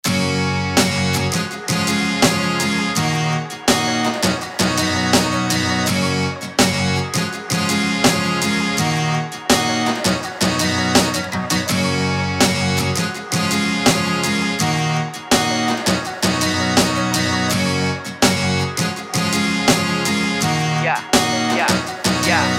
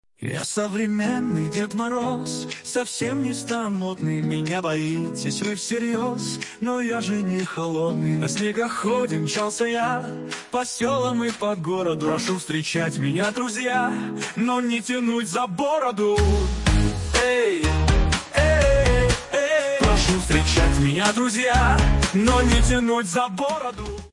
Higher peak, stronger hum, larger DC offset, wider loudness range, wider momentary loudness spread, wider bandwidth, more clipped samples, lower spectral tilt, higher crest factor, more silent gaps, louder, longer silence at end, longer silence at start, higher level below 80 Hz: first, 0 dBFS vs -4 dBFS; neither; neither; second, 1 LU vs 6 LU; second, 5 LU vs 8 LU; first, 17 kHz vs 11.5 kHz; neither; second, -3.5 dB/octave vs -5 dB/octave; about the same, 18 dB vs 18 dB; neither; first, -18 LUFS vs -22 LUFS; about the same, 0 s vs 0.05 s; second, 0.05 s vs 0.2 s; second, -48 dBFS vs -30 dBFS